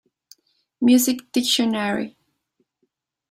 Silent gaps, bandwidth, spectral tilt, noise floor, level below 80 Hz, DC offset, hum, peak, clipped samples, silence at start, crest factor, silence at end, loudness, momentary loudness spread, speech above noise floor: none; 16 kHz; -3 dB/octave; -73 dBFS; -66 dBFS; under 0.1%; none; -6 dBFS; under 0.1%; 0.8 s; 18 dB; 1.2 s; -20 LUFS; 10 LU; 54 dB